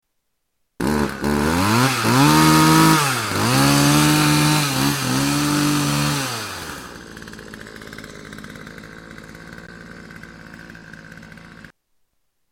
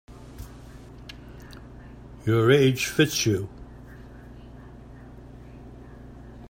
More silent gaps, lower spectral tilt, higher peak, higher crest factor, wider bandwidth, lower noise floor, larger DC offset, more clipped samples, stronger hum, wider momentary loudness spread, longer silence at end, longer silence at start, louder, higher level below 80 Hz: neither; about the same, -4 dB/octave vs -5 dB/octave; about the same, -2 dBFS vs -4 dBFS; second, 18 dB vs 24 dB; about the same, 17 kHz vs 16 kHz; first, -72 dBFS vs -44 dBFS; neither; neither; neither; about the same, 25 LU vs 26 LU; first, 0.85 s vs 0 s; first, 0.8 s vs 0.1 s; first, -17 LUFS vs -22 LUFS; first, -42 dBFS vs -48 dBFS